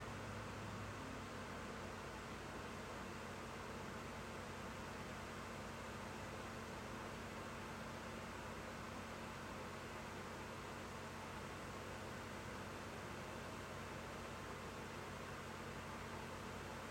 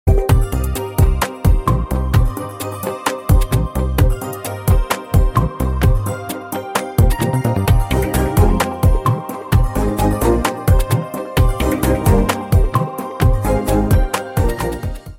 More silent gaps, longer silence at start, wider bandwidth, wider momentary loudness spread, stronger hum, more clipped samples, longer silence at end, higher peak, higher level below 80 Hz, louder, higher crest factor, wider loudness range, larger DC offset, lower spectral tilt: neither; about the same, 0 s vs 0.05 s; about the same, 16 kHz vs 17 kHz; second, 1 LU vs 7 LU; neither; neither; about the same, 0 s vs 0 s; second, -36 dBFS vs 0 dBFS; second, -64 dBFS vs -20 dBFS; second, -50 LUFS vs -17 LUFS; about the same, 14 dB vs 14 dB; about the same, 0 LU vs 2 LU; neither; second, -4.5 dB/octave vs -6.5 dB/octave